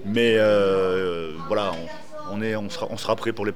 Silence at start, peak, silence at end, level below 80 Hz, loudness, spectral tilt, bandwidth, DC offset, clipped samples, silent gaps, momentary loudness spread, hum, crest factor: 0 s; -6 dBFS; 0 s; -60 dBFS; -23 LUFS; -5.5 dB/octave; 15.5 kHz; 2%; under 0.1%; none; 15 LU; none; 16 dB